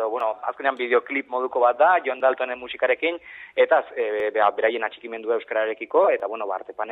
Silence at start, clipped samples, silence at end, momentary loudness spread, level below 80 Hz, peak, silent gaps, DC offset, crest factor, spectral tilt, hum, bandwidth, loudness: 0 s; under 0.1%; 0 s; 10 LU; -72 dBFS; -4 dBFS; none; under 0.1%; 18 dB; -5.5 dB/octave; none; 4.1 kHz; -23 LUFS